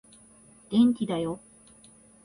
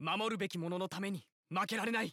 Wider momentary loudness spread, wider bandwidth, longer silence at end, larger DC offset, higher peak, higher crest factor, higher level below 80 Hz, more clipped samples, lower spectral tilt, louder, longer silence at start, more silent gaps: first, 12 LU vs 6 LU; second, 10.5 kHz vs 17 kHz; first, 0.9 s vs 0 s; neither; first, -12 dBFS vs -22 dBFS; about the same, 18 dB vs 16 dB; first, -64 dBFS vs -84 dBFS; neither; first, -6.5 dB/octave vs -4.5 dB/octave; first, -26 LUFS vs -38 LUFS; first, 0.7 s vs 0 s; second, none vs 1.32-1.43 s